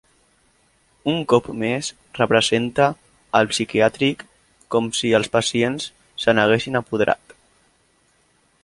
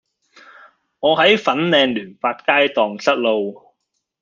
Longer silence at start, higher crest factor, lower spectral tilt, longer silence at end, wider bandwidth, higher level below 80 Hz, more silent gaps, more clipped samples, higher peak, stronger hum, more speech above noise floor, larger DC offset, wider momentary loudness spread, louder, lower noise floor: about the same, 1.05 s vs 1 s; about the same, 20 dB vs 18 dB; about the same, -4 dB/octave vs -4.5 dB/octave; first, 1.5 s vs 0.7 s; first, 11.5 kHz vs 7.4 kHz; first, -56 dBFS vs -64 dBFS; neither; neither; about the same, -2 dBFS vs -2 dBFS; neither; second, 42 dB vs 57 dB; neither; about the same, 9 LU vs 9 LU; second, -20 LUFS vs -17 LUFS; second, -61 dBFS vs -74 dBFS